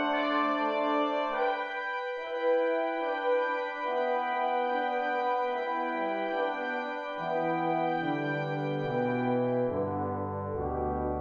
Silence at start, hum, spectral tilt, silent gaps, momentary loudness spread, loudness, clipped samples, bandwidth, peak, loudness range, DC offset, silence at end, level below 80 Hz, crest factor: 0 s; none; -7.5 dB/octave; none; 5 LU; -30 LUFS; under 0.1%; 6.6 kHz; -16 dBFS; 2 LU; under 0.1%; 0 s; -54 dBFS; 14 dB